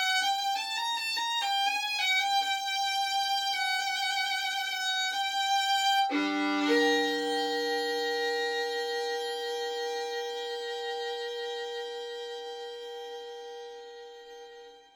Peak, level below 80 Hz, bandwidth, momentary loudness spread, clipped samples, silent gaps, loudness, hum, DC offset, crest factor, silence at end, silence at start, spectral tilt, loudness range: -14 dBFS; -82 dBFS; over 20 kHz; 15 LU; under 0.1%; none; -29 LUFS; none; under 0.1%; 18 dB; 0.15 s; 0 s; 0 dB/octave; 10 LU